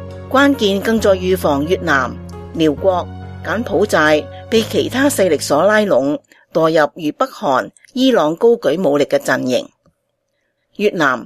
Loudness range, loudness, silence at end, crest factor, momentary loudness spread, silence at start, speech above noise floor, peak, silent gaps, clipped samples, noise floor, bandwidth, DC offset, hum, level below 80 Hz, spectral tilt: 2 LU; -15 LUFS; 0 s; 16 dB; 9 LU; 0 s; 54 dB; 0 dBFS; none; under 0.1%; -69 dBFS; 14.5 kHz; under 0.1%; none; -46 dBFS; -4.5 dB/octave